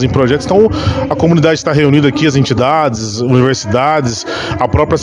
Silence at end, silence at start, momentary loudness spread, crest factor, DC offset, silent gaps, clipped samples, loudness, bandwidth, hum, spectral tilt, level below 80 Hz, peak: 0 s; 0 s; 6 LU; 10 dB; under 0.1%; none; 0.7%; -12 LUFS; 10.5 kHz; none; -6 dB/octave; -34 dBFS; 0 dBFS